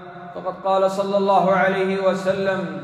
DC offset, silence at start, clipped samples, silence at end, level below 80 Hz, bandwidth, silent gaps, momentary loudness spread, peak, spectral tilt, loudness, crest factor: under 0.1%; 0 s; under 0.1%; 0 s; -66 dBFS; 11.5 kHz; none; 12 LU; -4 dBFS; -6 dB/octave; -20 LUFS; 16 dB